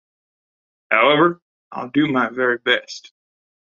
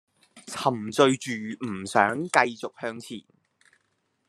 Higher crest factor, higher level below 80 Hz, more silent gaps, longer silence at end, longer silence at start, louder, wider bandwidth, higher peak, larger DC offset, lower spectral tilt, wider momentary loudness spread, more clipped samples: second, 20 dB vs 26 dB; first, -66 dBFS vs -72 dBFS; first, 1.42-1.71 s vs none; second, 0.8 s vs 1.1 s; first, 0.9 s vs 0.35 s; first, -18 LUFS vs -25 LUFS; second, 7.4 kHz vs 13 kHz; about the same, -2 dBFS vs -2 dBFS; neither; about the same, -5 dB/octave vs -4 dB/octave; first, 21 LU vs 16 LU; neither